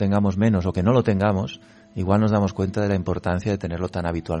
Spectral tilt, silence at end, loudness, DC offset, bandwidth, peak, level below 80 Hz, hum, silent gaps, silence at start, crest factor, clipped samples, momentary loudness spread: -8 dB/octave; 0 s; -22 LUFS; under 0.1%; 9.4 kHz; -6 dBFS; -44 dBFS; none; none; 0 s; 16 dB; under 0.1%; 8 LU